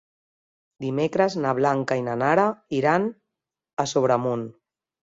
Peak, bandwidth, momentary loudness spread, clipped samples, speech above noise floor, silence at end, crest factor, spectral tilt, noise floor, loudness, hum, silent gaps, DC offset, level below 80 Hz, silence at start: -6 dBFS; 7.8 kHz; 10 LU; under 0.1%; 62 dB; 0.6 s; 18 dB; -6 dB/octave; -84 dBFS; -23 LUFS; none; 3.73-3.77 s; under 0.1%; -64 dBFS; 0.8 s